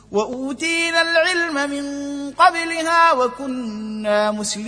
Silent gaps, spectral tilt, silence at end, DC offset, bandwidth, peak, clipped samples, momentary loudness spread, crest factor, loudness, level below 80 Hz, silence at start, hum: none; -2.5 dB/octave; 0 s; under 0.1%; 10.5 kHz; -2 dBFS; under 0.1%; 12 LU; 18 dB; -19 LUFS; -56 dBFS; 0.1 s; 50 Hz at -55 dBFS